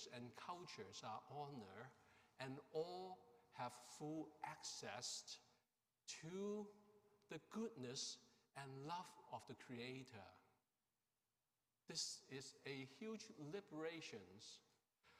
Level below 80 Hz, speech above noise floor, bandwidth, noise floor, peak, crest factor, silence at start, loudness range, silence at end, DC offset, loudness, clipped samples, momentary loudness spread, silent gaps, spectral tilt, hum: under -90 dBFS; over 36 dB; 15.5 kHz; under -90 dBFS; -34 dBFS; 20 dB; 0 s; 3 LU; 0 s; under 0.1%; -54 LUFS; under 0.1%; 11 LU; none; -3.5 dB/octave; none